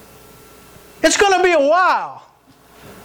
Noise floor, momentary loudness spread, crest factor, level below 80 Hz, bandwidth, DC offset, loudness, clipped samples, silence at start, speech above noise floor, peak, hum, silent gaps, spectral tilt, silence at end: -49 dBFS; 8 LU; 12 dB; -50 dBFS; over 20 kHz; under 0.1%; -14 LUFS; under 0.1%; 1 s; 35 dB; -6 dBFS; none; none; -1.5 dB/octave; 0.15 s